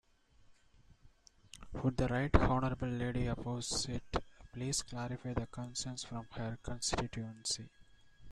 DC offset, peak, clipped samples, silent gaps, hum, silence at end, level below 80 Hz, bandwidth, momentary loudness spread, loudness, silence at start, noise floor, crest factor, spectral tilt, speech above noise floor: under 0.1%; -10 dBFS; under 0.1%; none; none; 0 s; -46 dBFS; 13 kHz; 12 LU; -38 LUFS; 0.4 s; -64 dBFS; 28 dB; -4.5 dB/octave; 28 dB